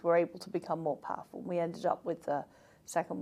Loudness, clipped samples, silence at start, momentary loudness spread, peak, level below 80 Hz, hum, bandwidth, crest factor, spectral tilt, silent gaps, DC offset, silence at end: -35 LUFS; under 0.1%; 0.05 s; 9 LU; -16 dBFS; -78 dBFS; none; 14.5 kHz; 18 dB; -6 dB/octave; none; under 0.1%; 0 s